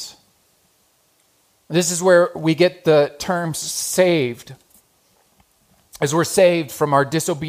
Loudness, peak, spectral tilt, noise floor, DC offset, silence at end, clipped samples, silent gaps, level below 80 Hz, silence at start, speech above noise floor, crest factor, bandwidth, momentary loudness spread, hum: -18 LUFS; -2 dBFS; -4.5 dB/octave; -61 dBFS; under 0.1%; 0 s; under 0.1%; none; -60 dBFS; 0 s; 43 dB; 18 dB; 15.5 kHz; 8 LU; none